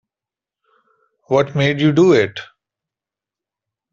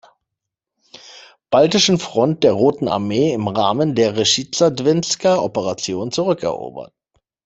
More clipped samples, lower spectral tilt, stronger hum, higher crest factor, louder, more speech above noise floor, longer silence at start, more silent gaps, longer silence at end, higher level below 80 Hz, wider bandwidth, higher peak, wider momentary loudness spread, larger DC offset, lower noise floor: neither; first, -7 dB/octave vs -4.5 dB/octave; neither; about the same, 18 dB vs 18 dB; about the same, -15 LUFS vs -17 LUFS; first, 74 dB vs 65 dB; first, 1.3 s vs 1.05 s; neither; first, 1.5 s vs 0.6 s; about the same, -58 dBFS vs -56 dBFS; second, 7.4 kHz vs 8.4 kHz; about the same, -2 dBFS vs 0 dBFS; about the same, 10 LU vs 8 LU; neither; first, -89 dBFS vs -82 dBFS